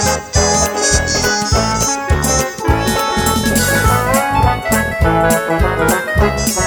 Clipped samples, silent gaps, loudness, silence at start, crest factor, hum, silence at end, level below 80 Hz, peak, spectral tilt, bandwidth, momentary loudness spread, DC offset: under 0.1%; none; -14 LUFS; 0 s; 14 dB; none; 0 s; -22 dBFS; 0 dBFS; -3.5 dB/octave; over 20 kHz; 3 LU; under 0.1%